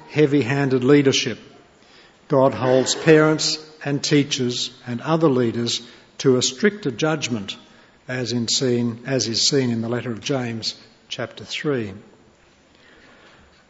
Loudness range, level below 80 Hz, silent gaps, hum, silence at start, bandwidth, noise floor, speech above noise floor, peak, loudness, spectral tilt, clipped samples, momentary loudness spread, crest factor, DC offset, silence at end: 8 LU; -62 dBFS; none; none; 0.05 s; 8.2 kHz; -54 dBFS; 34 dB; -2 dBFS; -20 LUFS; -4.5 dB/octave; under 0.1%; 14 LU; 20 dB; under 0.1%; 1.7 s